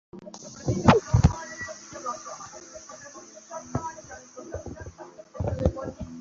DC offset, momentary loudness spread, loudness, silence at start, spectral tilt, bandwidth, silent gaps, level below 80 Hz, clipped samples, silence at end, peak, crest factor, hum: under 0.1%; 23 LU; -27 LUFS; 0.15 s; -6 dB/octave; 7.8 kHz; none; -38 dBFS; under 0.1%; 0 s; -2 dBFS; 26 dB; none